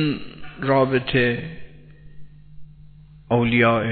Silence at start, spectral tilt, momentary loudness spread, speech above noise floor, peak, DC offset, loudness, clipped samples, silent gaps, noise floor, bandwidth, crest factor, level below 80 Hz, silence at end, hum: 0 s; -10.5 dB/octave; 19 LU; 26 dB; -4 dBFS; under 0.1%; -20 LUFS; under 0.1%; none; -45 dBFS; 4.5 kHz; 20 dB; -48 dBFS; 0 s; 50 Hz at -50 dBFS